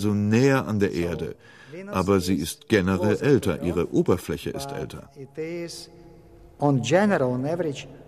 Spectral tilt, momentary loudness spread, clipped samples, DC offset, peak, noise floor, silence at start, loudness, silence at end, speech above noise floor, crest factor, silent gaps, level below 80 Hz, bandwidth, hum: -6.5 dB/octave; 16 LU; under 0.1%; under 0.1%; -6 dBFS; -49 dBFS; 0 s; -24 LUFS; 0.05 s; 25 dB; 18 dB; none; -50 dBFS; 15 kHz; none